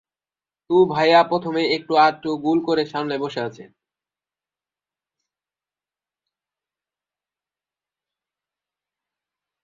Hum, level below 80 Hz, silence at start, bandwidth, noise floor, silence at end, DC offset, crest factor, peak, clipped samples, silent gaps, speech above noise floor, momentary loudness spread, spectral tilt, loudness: 50 Hz at -60 dBFS; -68 dBFS; 0.7 s; 7.6 kHz; under -90 dBFS; 6 s; under 0.1%; 20 dB; -4 dBFS; under 0.1%; none; over 71 dB; 10 LU; -6 dB/octave; -19 LUFS